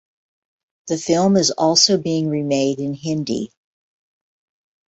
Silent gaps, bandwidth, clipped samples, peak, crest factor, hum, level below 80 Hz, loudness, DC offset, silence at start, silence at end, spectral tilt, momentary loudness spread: none; 8.2 kHz; under 0.1%; -2 dBFS; 20 dB; none; -60 dBFS; -18 LUFS; under 0.1%; 0.85 s; 1.4 s; -4 dB/octave; 12 LU